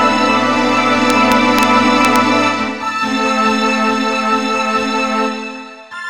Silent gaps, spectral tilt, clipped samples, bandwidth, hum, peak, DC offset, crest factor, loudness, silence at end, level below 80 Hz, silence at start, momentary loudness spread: none; -3.5 dB/octave; under 0.1%; 16.5 kHz; none; 0 dBFS; 0.8%; 14 dB; -13 LUFS; 0 s; -50 dBFS; 0 s; 7 LU